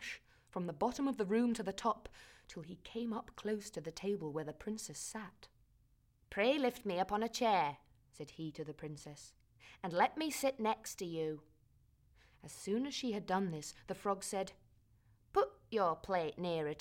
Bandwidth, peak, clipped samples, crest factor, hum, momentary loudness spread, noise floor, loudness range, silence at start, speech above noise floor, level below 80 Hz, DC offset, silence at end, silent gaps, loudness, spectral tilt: 16.5 kHz; -18 dBFS; under 0.1%; 22 dB; none; 17 LU; -72 dBFS; 6 LU; 0 s; 33 dB; -68 dBFS; under 0.1%; 0 s; none; -39 LUFS; -4.5 dB/octave